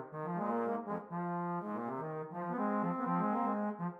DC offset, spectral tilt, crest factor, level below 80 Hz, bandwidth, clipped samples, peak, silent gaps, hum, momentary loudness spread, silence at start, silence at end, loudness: under 0.1%; -10.5 dB/octave; 14 dB; -86 dBFS; 3.8 kHz; under 0.1%; -24 dBFS; none; none; 7 LU; 0 s; 0 s; -37 LUFS